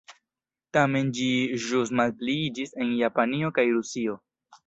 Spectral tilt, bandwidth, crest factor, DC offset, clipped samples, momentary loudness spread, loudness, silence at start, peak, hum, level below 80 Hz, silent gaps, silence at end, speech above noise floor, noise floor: -5 dB/octave; 8.2 kHz; 20 dB; under 0.1%; under 0.1%; 7 LU; -26 LUFS; 0.1 s; -6 dBFS; none; -66 dBFS; none; 0.1 s; 64 dB; -90 dBFS